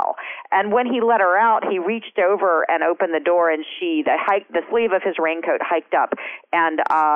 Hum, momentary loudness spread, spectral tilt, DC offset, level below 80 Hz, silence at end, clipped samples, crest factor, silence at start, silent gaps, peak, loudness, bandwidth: none; 7 LU; -6.5 dB/octave; under 0.1%; -68 dBFS; 0 s; under 0.1%; 12 dB; 0 s; none; -8 dBFS; -19 LUFS; 5.6 kHz